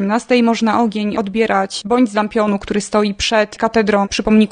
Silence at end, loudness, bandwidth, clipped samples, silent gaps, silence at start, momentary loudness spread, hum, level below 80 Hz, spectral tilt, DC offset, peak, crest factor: 0 s; -16 LUFS; 10 kHz; under 0.1%; none; 0 s; 4 LU; none; -42 dBFS; -5 dB/octave; under 0.1%; -2 dBFS; 14 dB